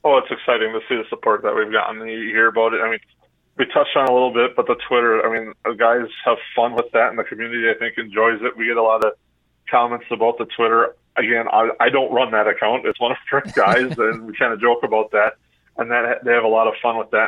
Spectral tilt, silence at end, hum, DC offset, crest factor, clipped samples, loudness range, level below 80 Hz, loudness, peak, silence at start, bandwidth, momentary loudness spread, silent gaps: -5.5 dB/octave; 0 s; none; under 0.1%; 16 dB; under 0.1%; 2 LU; -62 dBFS; -18 LUFS; -2 dBFS; 0.05 s; 9.4 kHz; 6 LU; none